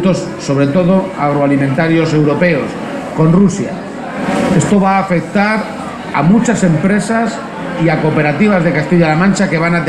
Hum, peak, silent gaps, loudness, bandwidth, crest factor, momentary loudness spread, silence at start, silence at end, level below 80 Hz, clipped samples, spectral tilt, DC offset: none; 0 dBFS; none; -13 LUFS; 11 kHz; 12 dB; 10 LU; 0 s; 0 s; -42 dBFS; under 0.1%; -6.5 dB/octave; under 0.1%